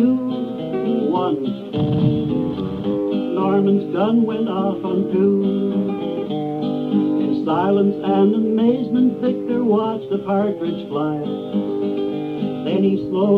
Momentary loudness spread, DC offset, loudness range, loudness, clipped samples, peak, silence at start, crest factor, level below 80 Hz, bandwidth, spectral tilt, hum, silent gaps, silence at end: 7 LU; under 0.1%; 3 LU; -20 LUFS; under 0.1%; -4 dBFS; 0 s; 14 dB; -54 dBFS; 4.9 kHz; -10 dB/octave; none; none; 0 s